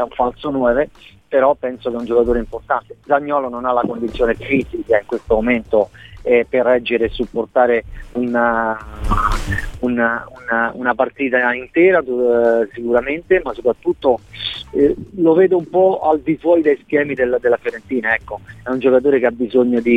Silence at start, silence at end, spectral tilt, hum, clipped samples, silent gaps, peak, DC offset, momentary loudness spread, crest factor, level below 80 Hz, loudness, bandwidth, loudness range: 0 s; 0 s; -6.5 dB/octave; none; under 0.1%; none; -2 dBFS; 0.2%; 8 LU; 16 dB; -34 dBFS; -17 LUFS; 11 kHz; 3 LU